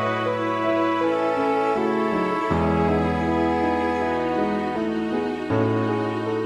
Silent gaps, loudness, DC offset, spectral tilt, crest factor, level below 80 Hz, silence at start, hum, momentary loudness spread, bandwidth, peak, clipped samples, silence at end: none; -23 LUFS; under 0.1%; -7.5 dB/octave; 14 dB; -44 dBFS; 0 s; none; 3 LU; 10.5 kHz; -8 dBFS; under 0.1%; 0 s